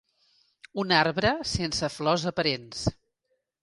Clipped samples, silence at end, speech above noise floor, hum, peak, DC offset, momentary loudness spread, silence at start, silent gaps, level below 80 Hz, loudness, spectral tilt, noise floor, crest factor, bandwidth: under 0.1%; 0.7 s; 51 dB; none; -6 dBFS; under 0.1%; 10 LU; 0.75 s; none; -50 dBFS; -26 LUFS; -4 dB/octave; -77 dBFS; 24 dB; 11.5 kHz